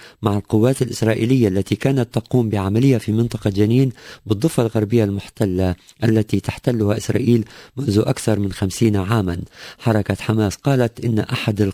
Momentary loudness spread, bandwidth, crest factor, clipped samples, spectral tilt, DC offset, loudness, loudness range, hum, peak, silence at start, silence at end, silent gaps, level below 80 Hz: 6 LU; 16 kHz; 16 dB; under 0.1%; -7 dB/octave; under 0.1%; -19 LUFS; 2 LU; none; -2 dBFS; 0 s; 0 s; none; -40 dBFS